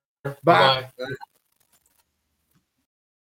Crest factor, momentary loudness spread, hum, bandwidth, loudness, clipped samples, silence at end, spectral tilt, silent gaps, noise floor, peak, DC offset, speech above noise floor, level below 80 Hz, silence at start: 24 dB; 19 LU; none; 17 kHz; -19 LUFS; under 0.1%; 2.05 s; -5.5 dB/octave; none; -74 dBFS; 0 dBFS; under 0.1%; 53 dB; -68 dBFS; 0.25 s